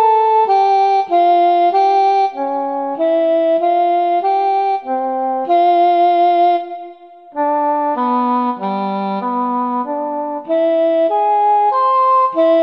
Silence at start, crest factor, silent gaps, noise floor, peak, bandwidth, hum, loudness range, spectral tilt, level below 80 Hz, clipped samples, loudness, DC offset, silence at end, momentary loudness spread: 0 s; 10 dB; none; -37 dBFS; -4 dBFS; 6.2 kHz; none; 4 LU; -7 dB/octave; -70 dBFS; under 0.1%; -15 LUFS; 0.1%; 0 s; 8 LU